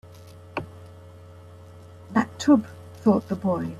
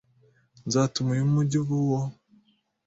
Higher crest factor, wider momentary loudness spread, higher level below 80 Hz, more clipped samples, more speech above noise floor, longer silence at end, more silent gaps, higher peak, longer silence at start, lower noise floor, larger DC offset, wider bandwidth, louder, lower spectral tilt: about the same, 18 dB vs 16 dB; first, 26 LU vs 8 LU; about the same, -60 dBFS vs -60 dBFS; neither; second, 24 dB vs 41 dB; second, 0 s vs 0.75 s; neither; about the same, -8 dBFS vs -10 dBFS; second, 0.05 s vs 0.65 s; second, -45 dBFS vs -65 dBFS; neither; first, 13 kHz vs 8 kHz; about the same, -24 LUFS vs -26 LUFS; about the same, -7 dB/octave vs -6.5 dB/octave